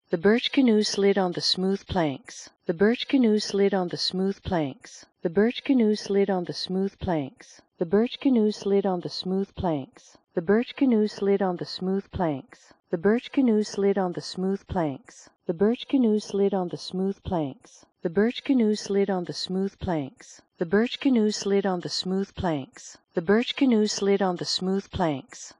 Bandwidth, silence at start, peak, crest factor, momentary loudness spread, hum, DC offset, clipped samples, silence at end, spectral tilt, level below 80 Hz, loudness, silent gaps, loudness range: 10.5 kHz; 0.1 s; -8 dBFS; 16 dB; 11 LU; none; under 0.1%; under 0.1%; 0.1 s; -5.5 dB/octave; -54 dBFS; -25 LUFS; none; 2 LU